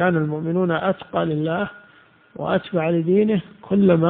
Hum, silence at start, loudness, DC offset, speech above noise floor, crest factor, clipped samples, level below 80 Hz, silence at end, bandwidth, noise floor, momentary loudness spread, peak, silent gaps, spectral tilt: none; 0 s; -21 LUFS; under 0.1%; 32 dB; 18 dB; under 0.1%; -56 dBFS; 0 s; 4.1 kHz; -52 dBFS; 7 LU; -2 dBFS; none; -6.5 dB/octave